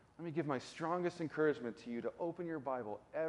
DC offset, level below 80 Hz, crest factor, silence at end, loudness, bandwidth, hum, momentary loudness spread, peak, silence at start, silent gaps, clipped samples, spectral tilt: under 0.1%; -78 dBFS; 18 dB; 0 s; -40 LUFS; 11.5 kHz; none; 7 LU; -22 dBFS; 0.2 s; none; under 0.1%; -6.5 dB/octave